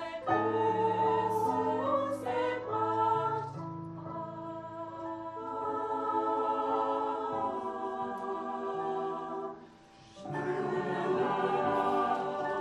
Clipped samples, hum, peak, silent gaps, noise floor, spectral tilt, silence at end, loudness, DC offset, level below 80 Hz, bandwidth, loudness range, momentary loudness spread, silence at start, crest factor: under 0.1%; none; -18 dBFS; none; -56 dBFS; -7 dB/octave; 0 s; -33 LUFS; under 0.1%; -70 dBFS; 13 kHz; 6 LU; 12 LU; 0 s; 14 dB